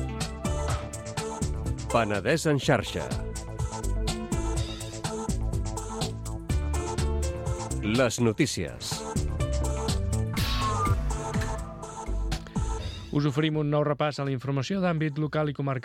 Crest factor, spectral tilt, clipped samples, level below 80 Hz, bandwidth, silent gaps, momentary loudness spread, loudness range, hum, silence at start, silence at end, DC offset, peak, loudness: 20 dB; -5.5 dB/octave; under 0.1%; -34 dBFS; 16.5 kHz; none; 9 LU; 4 LU; none; 0 s; 0 s; under 0.1%; -8 dBFS; -29 LUFS